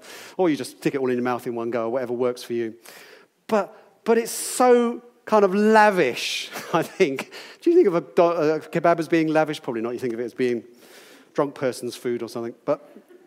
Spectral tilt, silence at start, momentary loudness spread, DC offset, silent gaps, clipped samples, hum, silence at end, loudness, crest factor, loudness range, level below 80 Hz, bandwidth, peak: -5 dB/octave; 0.05 s; 12 LU; under 0.1%; none; under 0.1%; none; 0.3 s; -23 LUFS; 20 dB; 7 LU; -80 dBFS; 16 kHz; -4 dBFS